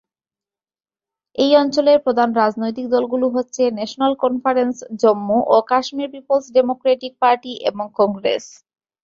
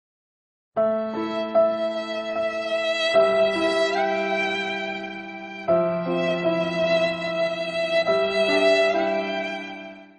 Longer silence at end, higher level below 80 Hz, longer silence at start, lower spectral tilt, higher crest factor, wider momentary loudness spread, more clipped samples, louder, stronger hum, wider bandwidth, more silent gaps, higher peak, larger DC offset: first, 0.55 s vs 0.15 s; about the same, -62 dBFS vs -64 dBFS; first, 1.4 s vs 0.75 s; about the same, -4.5 dB/octave vs -5 dB/octave; about the same, 16 dB vs 16 dB; second, 8 LU vs 11 LU; neither; first, -18 LUFS vs -23 LUFS; neither; second, 7.6 kHz vs 9.8 kHz; neither; first, -2 dBFS vs -8 dBFS; neither